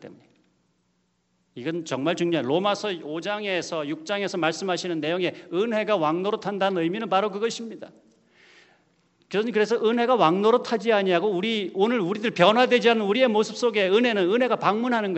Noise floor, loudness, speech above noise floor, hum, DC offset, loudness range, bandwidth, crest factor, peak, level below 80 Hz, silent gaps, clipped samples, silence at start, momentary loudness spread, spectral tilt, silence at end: -70 dBFS; -23 LUFS; 47 dB; none; under 0.1%; 7 LU; 8.2 kHz; 22 dB; -2 dBFS; -74 dBFS; none; under 0.1%; 0 s; 10 LU; -5 dB/octave; 0 s